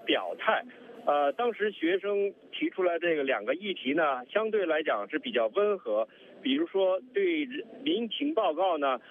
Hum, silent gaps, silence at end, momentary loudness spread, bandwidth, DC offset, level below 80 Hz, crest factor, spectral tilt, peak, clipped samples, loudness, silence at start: none; none; 0.15 s; 5 LU; 3.9 kHz; under 0.1%; -88 dBFS; 18 dB; -6.5 dB/octave; -10 dBFS; under 0.1%; -29 LUFS; 0 s